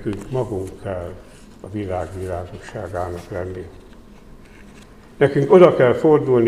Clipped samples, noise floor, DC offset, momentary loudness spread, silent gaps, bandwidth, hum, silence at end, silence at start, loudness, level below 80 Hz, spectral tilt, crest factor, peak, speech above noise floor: under 0.1%; -43 dBFS; 0.1%; 21 LU; none; 12 kHz; none; 0 s; 0 s; -19 LUFS; -46 dBFS; -8 dB/octave; 20 dB; 0 dBFS; 25 dB